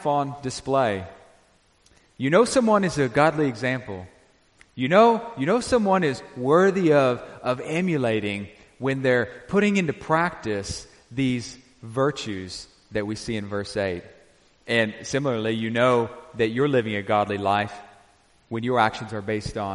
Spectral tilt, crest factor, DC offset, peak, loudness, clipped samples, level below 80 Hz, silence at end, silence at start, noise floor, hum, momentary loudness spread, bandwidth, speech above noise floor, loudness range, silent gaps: -5.5 dB/octave; 20 dB; under 0.1%; -4 dBFS; -23 LUFS; under 0.1%; -54 dBFS; 0 s; 0 s; -60 dBFS; none; 14 LU; 11.5 kHz; 37 dB; 7 LU; none